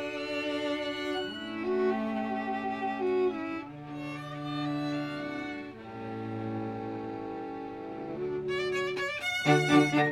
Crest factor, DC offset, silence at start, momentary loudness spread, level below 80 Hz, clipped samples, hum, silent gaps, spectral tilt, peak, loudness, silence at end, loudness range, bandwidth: 22 dB; under 0.1%; 0 s; 14 LU; -64 dBFS; under 0.1%; none; none; -5.5 dB/octave; -10 dBFS; -32 LUFS; 0 s; 6 LU; 14.5 kHz